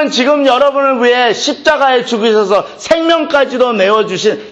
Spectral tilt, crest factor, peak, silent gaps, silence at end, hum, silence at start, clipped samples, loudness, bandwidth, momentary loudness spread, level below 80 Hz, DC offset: -3.5 dB/octave; 10 dB; 0 dBFS; none; 0 s; none; 0 s; under 0.1%; -11 LUFS; 8.6 kHz; 4 LU; -52 dBFS; under 0.1%